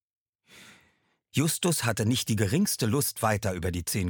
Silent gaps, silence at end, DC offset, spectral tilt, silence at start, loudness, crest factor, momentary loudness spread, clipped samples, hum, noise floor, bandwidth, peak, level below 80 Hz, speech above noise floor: none; 0 s; under 0.1%; -4.5 dB/octave; 0.55 s; -27 LUFS; 18 dB; 5 LU; under 0.1%; none; -69 dBFS; 19 kHz; -10 dBFS; -52 dBFS; 43 dB